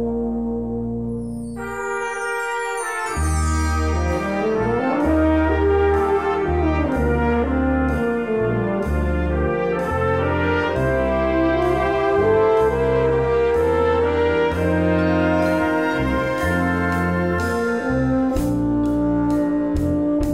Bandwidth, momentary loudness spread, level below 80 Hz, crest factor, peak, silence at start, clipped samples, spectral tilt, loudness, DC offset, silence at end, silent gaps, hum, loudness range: 15 kHz; 6 LU; -30 dBFS; 12 dB; -6 dBFS; 0 s; under 0.1%; -7 dB/octave; -20 LUFS; 0.3%; 0 s; none; none; 4 LU